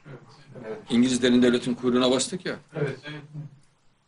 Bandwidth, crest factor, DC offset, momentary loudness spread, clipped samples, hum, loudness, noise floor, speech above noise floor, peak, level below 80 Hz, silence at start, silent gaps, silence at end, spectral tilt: 11 kHz; 18 dB; under 0.1%; 21 LU; under 0.1%; none; -24 LUFS; -59 dBFS; 35 dB; -8 dBFS; -58 dBFS; 0.05 s; none; 0.6 s; -4.5 dB/octave